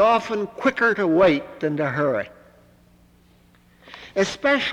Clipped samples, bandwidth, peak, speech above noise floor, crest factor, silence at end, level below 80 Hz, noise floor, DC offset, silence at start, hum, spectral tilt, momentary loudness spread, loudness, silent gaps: under 0.1%; 11.5 kHz; -6 dBFS; 34 dB; 16 dB; 0 s; -56 dBFS; -55 dBFS; under 0.1%; 0 s; 60 Hz at -65 dBFS; -5.5 dB/octave; 11 LU; -21 LUFS; none